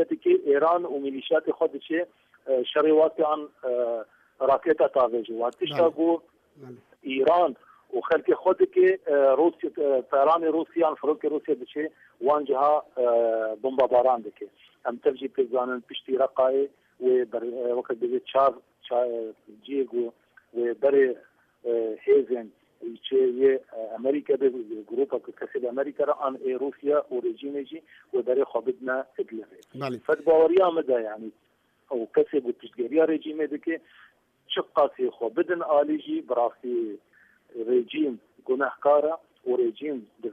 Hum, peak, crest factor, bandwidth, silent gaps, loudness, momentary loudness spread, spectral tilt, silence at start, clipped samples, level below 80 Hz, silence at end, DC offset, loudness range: none; -10 dBFS; 16 dB; 5.6 kHz; none; -25 LUFS; 13 LU; -7 dB/octave; 0 s; under 0.1%; -74 dBFS; 0 s; under 0.1%; 5 LU